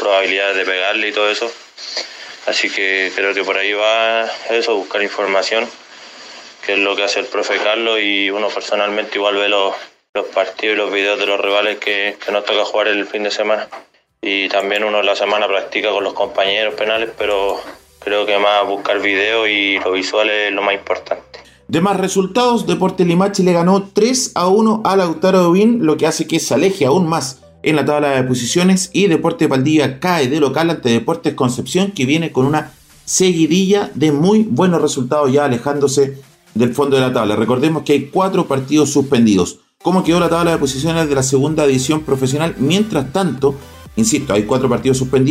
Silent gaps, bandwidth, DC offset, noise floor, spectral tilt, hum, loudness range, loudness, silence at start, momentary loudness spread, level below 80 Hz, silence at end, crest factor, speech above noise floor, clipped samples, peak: 10.09-10.13 s; 16 kHz; under 0.1%; -37 dBFS; -4.5 dB/octave; none; 3 LU; -15 LUFS; 0 s; 7 LU; -48 dBFS; 0 s; 12 dB; 22 dB; under 0.1%; -2 dBFS